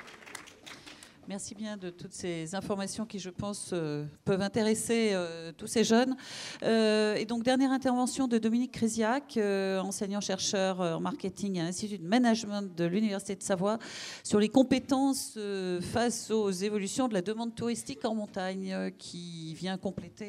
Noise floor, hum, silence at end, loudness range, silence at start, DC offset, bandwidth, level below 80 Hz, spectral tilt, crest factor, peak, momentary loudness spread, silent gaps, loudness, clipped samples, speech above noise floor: -52 dBFS; none; 0 s; 7 LU; 0 s; under 0.1%; 14.5 kHz; -66 dBFS; -4.5 dB/octave; 20 dB; -10 dBFS; 14 LU; none; -31 LUFS; under 0.1%; 21 dB